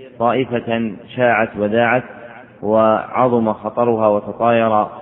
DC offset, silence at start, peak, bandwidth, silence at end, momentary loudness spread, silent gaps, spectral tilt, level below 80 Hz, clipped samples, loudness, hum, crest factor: under 0.1%; 0 s; 0 dBFS; 3.9 kHz; 0 s; 7 LU; none; -11 dB/octave; -56 dBFS; under 0.1%; -17 LUFS; none; 16 dB